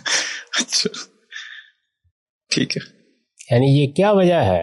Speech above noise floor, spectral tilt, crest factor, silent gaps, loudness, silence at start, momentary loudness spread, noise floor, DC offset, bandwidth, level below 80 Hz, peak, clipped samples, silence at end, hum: 40 dB; -4.5 dB/octave; 14 dB; 2.11-2.40 s; -18 LUFS; 0.05 s; 19 LU; -57 dBFS; under 0.1%; 11.5 kHz; -60 dBFS; -6 dBFS; under 0.1%; 0 s; none